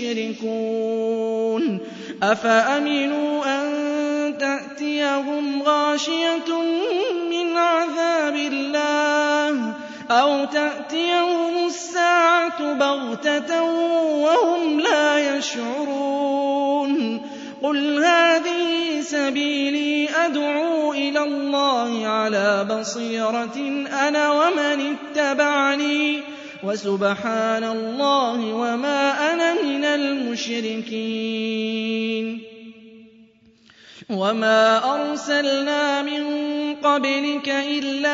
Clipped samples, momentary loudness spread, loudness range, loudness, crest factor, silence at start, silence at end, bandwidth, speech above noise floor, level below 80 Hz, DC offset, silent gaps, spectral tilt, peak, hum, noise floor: under 0.1%; 8 LU; 3 LU; -21 LUFS; 16 dB; 0 s; 0 s; 7.8 kHz; 33 dB; -76 dBFS; under 0.1%; none; -3.5 dB/octave; -4 dBFS; none; -54 dBFS